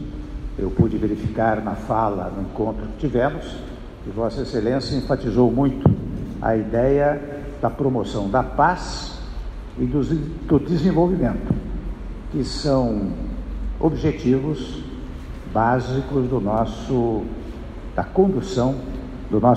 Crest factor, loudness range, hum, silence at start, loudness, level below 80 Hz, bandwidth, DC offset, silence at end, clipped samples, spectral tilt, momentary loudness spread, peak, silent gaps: 18 dB; 3 LU; none; 0 s; -22 LUFS; -34 dBFS; 10 kHz; under 0.1%; 0 s; under 0.1%; -7.5 dB/octave; 15 LU; -4 dBFS; none